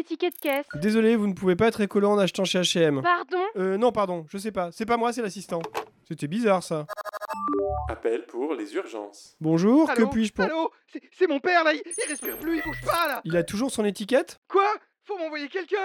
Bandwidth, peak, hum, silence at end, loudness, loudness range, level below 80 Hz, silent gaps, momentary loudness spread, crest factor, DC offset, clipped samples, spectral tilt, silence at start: 18.5 kHz; -8 dBFS; none; 0 s; -25 LUFS; 5 LU; -52 dBFS; 14.37-14.42 s; 11 LU; 16 dB; under 0.1%; under 0.1%; -5 dB/octave; 0 s